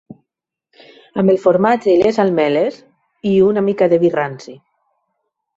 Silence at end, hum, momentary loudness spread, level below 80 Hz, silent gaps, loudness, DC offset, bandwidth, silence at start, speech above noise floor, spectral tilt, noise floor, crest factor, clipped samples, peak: 1 s; none; 11 LU; -58 dBFS; none; -15 LUFS; under 0.1%; 7.8 kHz; 0.1 s; 68 dB; -7.5 dB/octave; -82 dBFS; 16 dB; under 0.1%; -2 dBFS